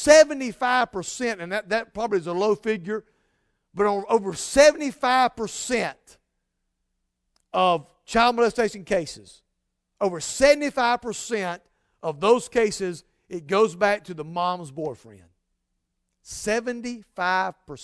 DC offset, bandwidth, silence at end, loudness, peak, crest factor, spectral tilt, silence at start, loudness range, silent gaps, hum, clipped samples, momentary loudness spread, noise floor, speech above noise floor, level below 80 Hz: under 0.1%; 11 kHz; 0 s; -23 LUFS; -2 dBFS; 22 dB; -3.5 dB/octave; 0 s; 5 LU; none; none; under 0.1%; 14 LU; -77 dBFS; 55 dB; -54 dBFS